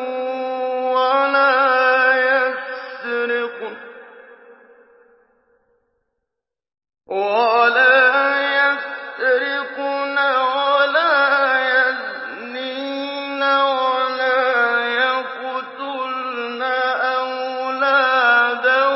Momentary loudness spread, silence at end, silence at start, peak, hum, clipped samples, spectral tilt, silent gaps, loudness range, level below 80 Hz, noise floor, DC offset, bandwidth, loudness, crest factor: 12 LU; 0 s; 0 s; -4 dBFS; none; under 0.1%; -5.5 dB/octave; none; 8 LU; -84 dBFS; -82 dBFS; under 0.1%; 5.8 kHz; -17 LUFS; 16 dB